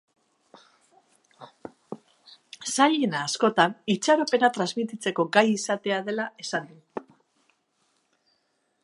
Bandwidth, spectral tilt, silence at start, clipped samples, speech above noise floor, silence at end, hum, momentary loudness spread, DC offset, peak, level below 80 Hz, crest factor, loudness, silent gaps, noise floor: 11.5 kHz; -3.5 dB/octave; 1.4 s; under 0.1%; 48 dB; 1.85 s; none; 22 LU; under 0.1%; -2 dBFS; -78 dBFS; 26 dB; -24 LUFS; none; -72 dBFS